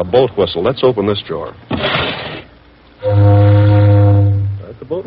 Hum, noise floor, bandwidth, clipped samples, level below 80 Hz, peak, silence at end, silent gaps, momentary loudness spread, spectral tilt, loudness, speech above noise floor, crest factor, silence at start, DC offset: none; -43 dBFS; 5 kHz; under 0.1%; -40 dBFS; 0 dBFS; 0.05 s; none; 15 LU; -6 dB/octave; -13 LUFS; 30 dB; 12 dB; 0 s; under 0.1%